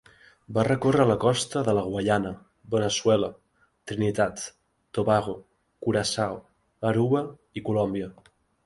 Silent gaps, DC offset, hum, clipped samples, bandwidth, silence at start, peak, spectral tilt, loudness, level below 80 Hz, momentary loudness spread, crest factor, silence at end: none; under 0.1%; none; under 0.1%; 11.5 kHz; 0.5 s; -8 dBFS; -5.5 dB/octave; -26 LUFS; -56 dBFS; 14 LU; 20 dB; 0.55 s